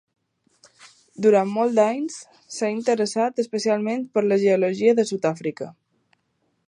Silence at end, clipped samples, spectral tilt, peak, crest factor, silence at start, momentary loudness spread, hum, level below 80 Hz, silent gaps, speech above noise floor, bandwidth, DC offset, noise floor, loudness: 0.95 s; under 0.1%; -5.5 dB/octave; -6 dBFS; 18 dB; 0.85 s; 12 LU; none; -76 dBFS; none; 50 dB; 11 kHz; under 0.1%; -71 dBFS; -22 LUFS